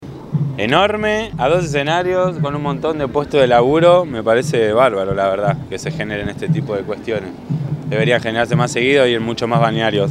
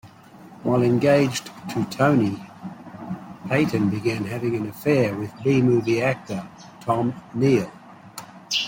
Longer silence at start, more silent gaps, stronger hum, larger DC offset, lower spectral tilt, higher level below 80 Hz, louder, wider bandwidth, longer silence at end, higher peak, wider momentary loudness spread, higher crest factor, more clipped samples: about the same, 0 s vs 0.05 s; neither; neither; neither; about the same, -6 dB/octave vs -6 dB/octave; first, -44 dBFS vs -60 dBFS; first, -16 LUFS vs -22 LUFS; second, 12.5 kHz vs 16.5 kHz; about the same, 0 s vs 0 s; first, 0 dBFS vs -6 dBFS; second, 10 LU vs 19 LU; about the same, 16 dB vs 18 dB; neither